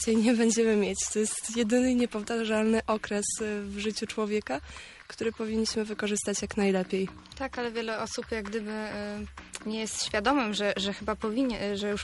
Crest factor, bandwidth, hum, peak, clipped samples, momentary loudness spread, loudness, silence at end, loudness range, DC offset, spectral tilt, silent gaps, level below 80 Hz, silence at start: 18 dB; 11.5 kHz; none; -12 dBFS; under 0.1%; 11 LU; -29 LUFS; 0 s; 5 LU; under 0.1%; -3.5 dB/octave; none; -54 dBFS; 0 s